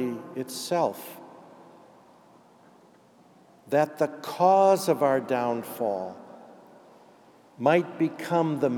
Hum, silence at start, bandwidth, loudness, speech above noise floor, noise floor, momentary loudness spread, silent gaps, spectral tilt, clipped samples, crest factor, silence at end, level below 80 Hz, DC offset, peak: none; 0 s; 19 kHz; -25 LUFS; 32 dB; -57 dBFS; 18 LU; none; -5.5 dB/octave; under 0.1%; 20 dB; 0 s; -88 dBFS; under 0.1%; -8 dBFS